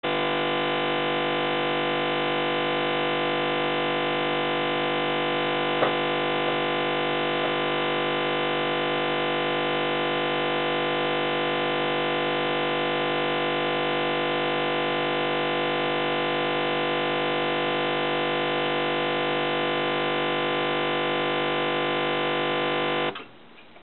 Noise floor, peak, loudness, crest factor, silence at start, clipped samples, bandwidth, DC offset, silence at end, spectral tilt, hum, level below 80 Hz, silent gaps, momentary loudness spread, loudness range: -50 dBFS; -10 dBFS; -25 LUFS; 16 dB; 0.05 s; under 0.1%; 4.5 kHz; 0.3%; 0.2 s; -8 dB/octave; 50 Hz at -80 dBFS; -72 dBFS; none; 0 LU; 0 LU